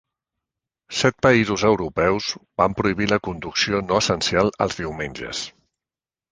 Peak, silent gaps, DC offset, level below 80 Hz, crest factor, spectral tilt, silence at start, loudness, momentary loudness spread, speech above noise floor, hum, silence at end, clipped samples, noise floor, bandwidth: -2 dBFS; none; under 0.1%; -46 dBFS; 20 dB; -4.5 dB/octave; 0.9 s; -21 LUFS; 11 LU; over 69 dB; none; 0.85 s; under 0.1%; under -90 dBFS; 10 kHz